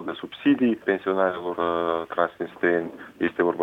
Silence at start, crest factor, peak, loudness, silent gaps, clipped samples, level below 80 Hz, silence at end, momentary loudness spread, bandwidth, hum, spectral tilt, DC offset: 0 s; 18 dB; -6 dBFS; -25 LUFS; none; under 0.1%; -64 dBFS; 0 s; 6 LU; 4.3 kHz; none; -7.5 dB/octave; under 0.1%